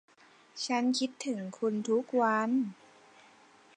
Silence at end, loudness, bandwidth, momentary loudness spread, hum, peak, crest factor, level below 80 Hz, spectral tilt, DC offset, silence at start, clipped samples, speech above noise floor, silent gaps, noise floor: 1.05 s; -31 LUFS; 10 kHz; 10 LU; none; -16 dBFS; 18 dB; -86 dBFS; -4 dB/octave; under 0.1%; 0.55 s; under 0.1%; 29 dB; none; -60 dBFS